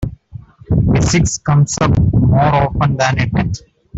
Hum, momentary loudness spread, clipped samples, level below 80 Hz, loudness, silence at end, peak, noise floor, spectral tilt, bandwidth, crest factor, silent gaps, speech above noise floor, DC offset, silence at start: none; 7 LU; under 0.1%; -28 dBFS; -14 LUFS; 0 s; -2 dBFS; -36 dBFS; -6 dB/octave; 8 kHz; 12 dB; none; 22 dB; under 0.1%; 0 s